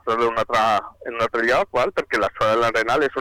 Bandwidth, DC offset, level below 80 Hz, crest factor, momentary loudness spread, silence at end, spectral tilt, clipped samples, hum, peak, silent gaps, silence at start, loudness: 18 kHz; under 0.1%; -50 dBFS; 8 dB; 5 LU; 0 s; -4 dB/octave; under 0.1%; none; -12 dBFS; none; 0.05 s; -20 LUFS